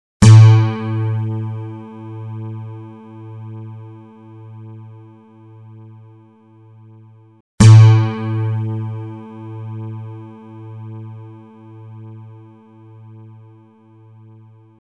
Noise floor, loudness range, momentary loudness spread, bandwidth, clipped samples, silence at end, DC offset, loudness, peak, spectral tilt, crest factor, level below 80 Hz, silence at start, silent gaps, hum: -46 dBFS; 23 LU; 30 LU; 10 kHz; under 0.1%; 2.75 s; under 0.1%; -12 LUFS; 0 dBFS; -7 dB/octave; 16 dB; -42 dBFS; 0.2 s; 7.40-7.58 s; none